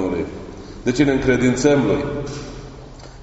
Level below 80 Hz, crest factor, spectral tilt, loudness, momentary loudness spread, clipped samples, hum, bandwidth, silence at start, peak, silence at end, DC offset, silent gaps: -38 dBFS; 18 dB; -6 dB/octave; -19 LUFS; 21 LU; under 0.1%; none; 8 kHz; 0 s; -2 dBFS; 0 s; under 0.1%; none